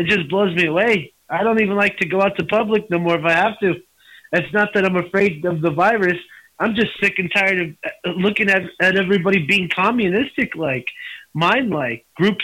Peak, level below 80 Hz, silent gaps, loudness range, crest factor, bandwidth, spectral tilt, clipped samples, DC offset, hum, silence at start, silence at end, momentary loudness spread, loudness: -6 dBFS; -54 dBFS; none; 2 LU; 14 dB; 16 kHz; -6 dB/octave; under 0.1%; under 0.1%; none; 0 s; 0 s; 7 LU; -18 LUFS